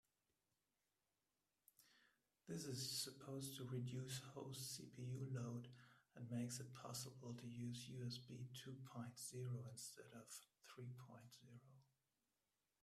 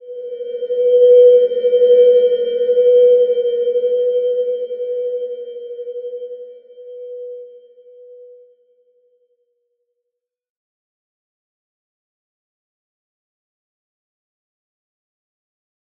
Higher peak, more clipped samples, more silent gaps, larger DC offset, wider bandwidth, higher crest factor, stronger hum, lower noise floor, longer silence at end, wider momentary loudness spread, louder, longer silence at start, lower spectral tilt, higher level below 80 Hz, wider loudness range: second, -34 dBFS vs -2 dBFS; neither; neither; neither; first, 15.5 kHz vs 3.4 kHz; about the same, 20 dB vs 16 dB; neither; first, under -90 dBFS vs -80 dBFS; second, 1 s vs 7.85 s; second, 14 LU vs 21 LU; second, -52 LUFS vs -13 LUFS; first, 1.8 s vs 0.05 s; second, -4.5 dB/octave vs -6 dB/octave; about the same, -86 dBFS vs -84 dBFS; second, 6 LU vs 23 LU